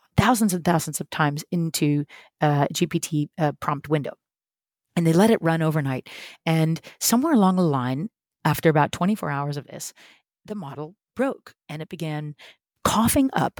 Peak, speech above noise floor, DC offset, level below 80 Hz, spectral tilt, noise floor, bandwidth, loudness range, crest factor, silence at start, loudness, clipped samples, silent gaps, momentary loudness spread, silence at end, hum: -4 dBFS; over 67 dB; under 0.1%; -52 dBFS; -5.5 dB/octave; under -90 dBFS; 19.5 kHz; 8 LU; 20 dB; 0.15 s; -23 LUFS; under 0.1%; none; 17 LU; 0.1 s; none